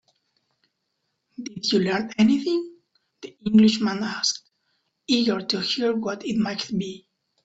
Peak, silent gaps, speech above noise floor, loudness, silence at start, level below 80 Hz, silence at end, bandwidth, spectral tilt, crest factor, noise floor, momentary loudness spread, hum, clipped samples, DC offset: -8 dBFS; none; 54 dB; -23 LUFS; 1.4 s; -64 dBFS; 0.5 s; 8 kHz; -4.5 dB/octave; 18 dB; -77 dBFS; 20 LU; none; under 0.1%; under 0.1%